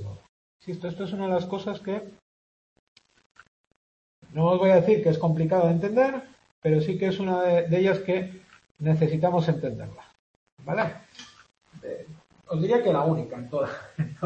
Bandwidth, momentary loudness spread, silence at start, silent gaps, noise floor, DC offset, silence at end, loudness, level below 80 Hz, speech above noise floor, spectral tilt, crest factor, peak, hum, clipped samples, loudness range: 7.4 kHz; 17 LU; 0 s; 0.29-0.60 s, 2.22-2.96 s, 3.26-3.35 s, 3.48-4.22 s, 6.51-6.62 s, 8.71-8.75 s, 10.19-10.57 s; under -90 dBFS; under 0.1%; 0 s; -25 LUFS; -62 dBFS; over 66 dB; -8.5 dB/octave; 18 dB; -8 dBFS; none; under 0.1%; 10 LU